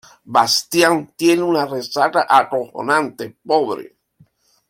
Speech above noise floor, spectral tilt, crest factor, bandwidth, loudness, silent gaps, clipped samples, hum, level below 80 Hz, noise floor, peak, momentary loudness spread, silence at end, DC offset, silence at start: 38 dB; -3.5 dB/octave; 18 dB; 16.5 kHz; -17 LUFS; none; under 0.1%; none; -62 dBFS; -55 dBFS; 0 dBFS; 9 LU; 0.85 s; under 0.1%; 0.25 s